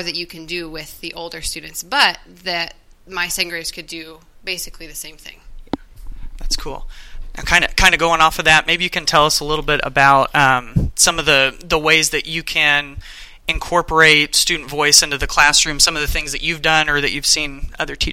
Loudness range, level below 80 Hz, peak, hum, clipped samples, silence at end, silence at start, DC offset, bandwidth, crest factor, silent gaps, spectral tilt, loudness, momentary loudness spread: 12 LU; -32 dBFS; 0 dBFS; none; under 0.1%; 0 s; 0 s; under 0.1%; 17 kHz; 18 dB; none; -1.5 dB/octave; -15 LUFS; 18 LU